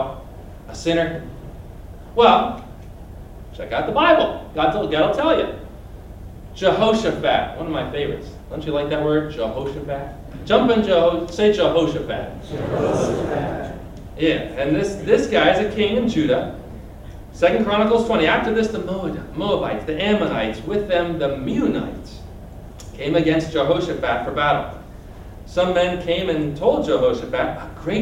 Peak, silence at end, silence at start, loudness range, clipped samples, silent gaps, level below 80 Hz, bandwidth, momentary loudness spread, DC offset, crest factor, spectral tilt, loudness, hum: 0 dBFS; 0 s; 0 s; 3 LU; under 0.1%; none; -40 dBFS; 16 kHz; 22 LU; under 0.1%; 20 dB; -6 dB/octave; -20 LUFS; none